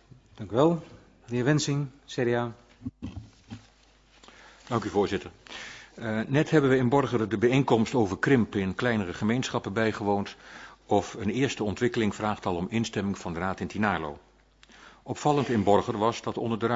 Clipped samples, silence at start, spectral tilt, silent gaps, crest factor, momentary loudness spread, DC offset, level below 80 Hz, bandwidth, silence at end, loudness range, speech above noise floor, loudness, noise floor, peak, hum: under 0.1%; 0.35 s; -6 dB/octave; none; 20 dB; 18 LU; under 0.1%; -56 dBFS; 8 kHz; 0 s; 9 LU; 33 dB; -27 LUFS; -59 dBFS; -8 dBFS; none